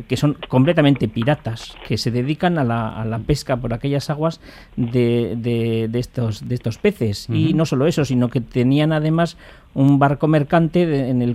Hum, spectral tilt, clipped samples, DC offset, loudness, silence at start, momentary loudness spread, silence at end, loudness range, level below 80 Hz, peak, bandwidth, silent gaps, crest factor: none; -7.5 dB/octave; under 0.1%; under 0.1%; -19 LUFS; 0 s; 9 LU; 0 s; 4 LU; -42 dBFS; -2 dBFS; 14 kHz; none; 16 dB